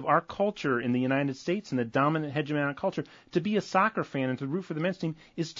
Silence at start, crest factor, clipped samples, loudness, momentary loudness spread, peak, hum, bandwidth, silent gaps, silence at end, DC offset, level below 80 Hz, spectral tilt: 0 s; 20 dB; under 0.1%; -29 LUFS; 7 LU; -10 dBFS; none; 7.6 kHz; none; 0 s; under 0.1%; -68 dBFS; -6.5 dB/octave